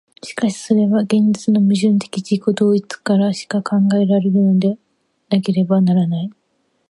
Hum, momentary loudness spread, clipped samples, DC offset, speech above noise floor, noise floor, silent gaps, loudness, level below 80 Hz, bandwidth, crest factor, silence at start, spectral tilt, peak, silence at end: none; 7 LU; under 0.1%; under 0.1%; 50 dB; -65 dBFS; none; -16 LUFS; -66 dBFS; 11.5 kHz; 14 dB; 0.25 s; -7 dB/octave; -2 dBFS; 0.6 s